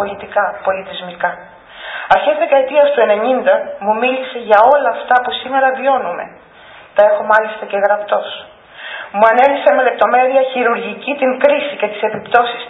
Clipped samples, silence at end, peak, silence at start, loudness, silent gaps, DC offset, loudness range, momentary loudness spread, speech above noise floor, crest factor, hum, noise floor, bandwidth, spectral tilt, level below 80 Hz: under 0.1%; 0 s; 0 dBFS; 0 s; -14 LUFS; none; under 0.1%; 3 LU; 13 LU; 26 dB; 14 dB; none; -40 dBFS; 4.6 kHz; -6 dB/octave; -58 dBFS